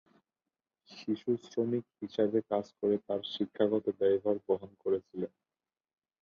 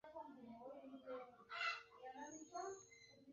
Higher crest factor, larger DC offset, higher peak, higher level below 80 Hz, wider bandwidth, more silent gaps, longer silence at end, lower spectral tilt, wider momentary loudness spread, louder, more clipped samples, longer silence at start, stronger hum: about the same, 18 dB vs 22 dB; neither; first, -14 dBFS vs -30 dBFS; first, -74 dBFS vs -88 dBFS; about the same, 7 kHz vs 7.4 kHz; neither; first, 0.95 s vs 0 s; first, -7.5 dB/octave vs 0 dB/octave; second, 9 LU vs 13 LU; first, -33 LUFS vs -52 LUFS; neither; first, 0.9 s vs 0.05 s; neither